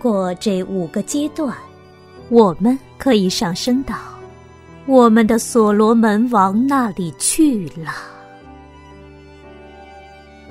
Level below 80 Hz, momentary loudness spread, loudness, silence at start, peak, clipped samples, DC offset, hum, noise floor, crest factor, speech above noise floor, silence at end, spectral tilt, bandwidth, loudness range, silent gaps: -46 dBFS; 15 LU; -16 LUFS; 0 s; 0 dBFS; under 0.1%; under 0.1%; none; -42 dBFS; 18 dB; 27 dB; 0 s; -5 dB/octave; 16 kHz; 7 LU; none